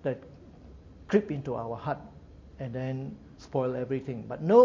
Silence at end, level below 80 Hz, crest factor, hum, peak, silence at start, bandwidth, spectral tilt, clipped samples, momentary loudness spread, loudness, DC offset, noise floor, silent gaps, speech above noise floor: 0 s; -56 dBFS; 22 dB; none; -8 dBFS; 0.05 s; 7.2 kHz; -8.5 dB/octave; under 0.1%; 24 LU; -32 LUFS; under 0.1%; -50 dBFS; none; 22 dB